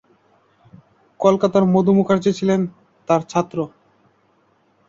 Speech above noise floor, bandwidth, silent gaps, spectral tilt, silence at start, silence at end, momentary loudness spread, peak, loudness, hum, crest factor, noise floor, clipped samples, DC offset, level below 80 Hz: 43 dB; 7.6 kHz; none; -7.5 dB/octave; 1.2 s; 1.2 s; 12 LU; -2 dBFS; -18 LUFS; none; 18 dB; -60 dBFS; under 0.1%; under 0.1%; -60 dBFS